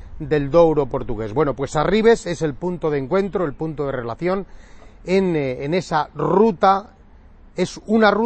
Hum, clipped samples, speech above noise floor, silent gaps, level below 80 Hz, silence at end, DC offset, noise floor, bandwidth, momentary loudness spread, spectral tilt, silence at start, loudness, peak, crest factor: none; under 0.1%; 26 dB; none; -40 dBFS; 0 s; under 0.1%; -45 dBFS; 8.8 kHz; 10 LU; -6.5 dB/octave; 0 s; -20 LUFS; -2 dBFS; 18 dB